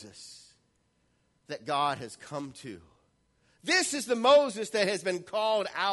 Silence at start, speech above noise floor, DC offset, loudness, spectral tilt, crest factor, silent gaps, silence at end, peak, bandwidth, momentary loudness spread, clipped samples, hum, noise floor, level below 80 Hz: 0 s; 43 dB; under 0.1%; -27 LUFS; -2.5 dB/octave; 20 dB; none; 0 s; -10 dBFS; 11.5 kHz; 23 LU; under 0.1%; none; -72 dBFS; -74 dBFS